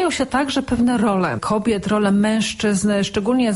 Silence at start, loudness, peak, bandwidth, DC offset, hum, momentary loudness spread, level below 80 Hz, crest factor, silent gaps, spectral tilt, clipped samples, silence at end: 0 s; -19 LUFS; -6 dBFS; 11.5 kHz; under 0.1%; none; 3 LU; -44 dBFS; 12 dB; none; -5 dB/octave; under 0.1%; 0 s